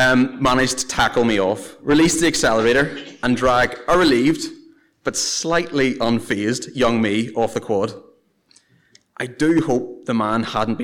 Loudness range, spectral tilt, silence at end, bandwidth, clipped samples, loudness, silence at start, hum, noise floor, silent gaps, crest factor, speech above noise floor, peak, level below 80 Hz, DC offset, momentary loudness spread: 5 LU; -4 dB/octave; 0 s; 18.5 kHz; under 0.1%; -19 LUFS; 0 s; none; -57 dBFS; none; 12 dB; 39 dB; -8 dBFS; -42 dBFS; 0.2%; 9 LU